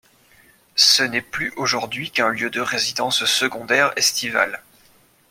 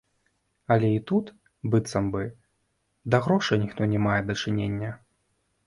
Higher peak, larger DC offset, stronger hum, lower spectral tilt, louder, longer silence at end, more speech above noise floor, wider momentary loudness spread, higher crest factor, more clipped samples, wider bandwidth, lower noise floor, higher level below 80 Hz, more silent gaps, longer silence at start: first, -2 dBFS vs -8 dBFS; neither; neither; second, -1 dB/octave vs -6.5 dB/octave; first, -19 LUFS vs -26 LUFS; about the same, 0.7 s vs 0.7 s; second, 35 dB vs 49 dB; second, 10 LU vs 14 LU; about the same, 20 dB vs 20 dB; neither; first, 16.5 kHz vs 11.5 kHz; second, -55 dBFS vs -73 dBFS; second, -62 dBFS vs -54 dBFS; neither; about the same, 0.75 s vs 0.7 s